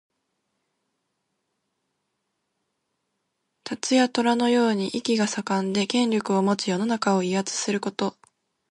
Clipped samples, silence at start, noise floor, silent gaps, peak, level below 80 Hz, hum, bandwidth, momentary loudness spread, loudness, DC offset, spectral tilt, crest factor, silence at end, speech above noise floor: under 0.1%; 3.65 s; -78 dBFS; none; -8 dBFS; -72 dBFS; none; 11.5 kHz; 8 LU; -24 LUFS; under 0.1%; -4.5 dB/octave; 18 dB; 0.6 s; 55 dB